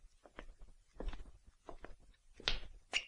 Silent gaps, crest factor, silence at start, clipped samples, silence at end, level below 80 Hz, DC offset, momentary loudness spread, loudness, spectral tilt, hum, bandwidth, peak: none; 32 dB; 0 s; under 0.1%; 0 s; -50 dBFS; under 0.1%; 24 LU; -44 LUFS; -2 dB/octave; none; 11 kHz; -14 dBFS